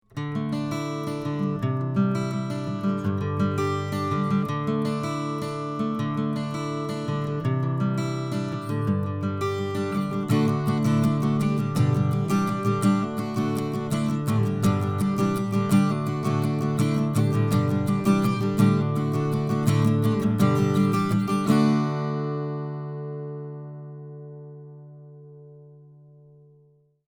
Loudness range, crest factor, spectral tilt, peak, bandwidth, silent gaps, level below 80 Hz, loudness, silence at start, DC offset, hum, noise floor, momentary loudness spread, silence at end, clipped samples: 5 LU; 18 dB; -7.5 dB/octave; -6 dBFS; 19.5 kHz; none; -58 dBFS; -25 LUFS; 0.15 s; under 0.1%; none; -59 dBFS; 9 LU; 1.25 s; under 0.1%